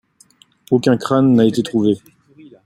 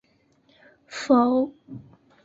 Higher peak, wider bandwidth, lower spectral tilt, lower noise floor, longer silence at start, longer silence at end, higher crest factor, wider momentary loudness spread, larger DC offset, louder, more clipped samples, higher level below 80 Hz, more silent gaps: first, -2 dBFS vs -8 dBFS; first, 12.5 kHz vs 7.8 kHz; first, -7 dB/octave vs -5.5 dB/octave; second, -52 dBFS vs -63 dBFS; second, 0.7 s vs 0.9 s; first, 0.7 s vs 0.45 s; about the same, 14 dB vs 18 dB; second, 6 LU vs 25 LU; neither; first, -16 LUFS vs -22 LUFS; neither; first, -58 dBFS vs -68 dBFS; neither